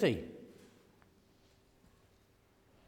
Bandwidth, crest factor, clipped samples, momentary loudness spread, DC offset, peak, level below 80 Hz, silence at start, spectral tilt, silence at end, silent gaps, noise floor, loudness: 17.5 kHz; 24 dB; under 0.1%; 29 LU; under 0.1%; -18 dBFS; -68 dBFS; 0 s; -6.5 dB/octave; 2.4 s; none; -68 dBFS; -39 LUFS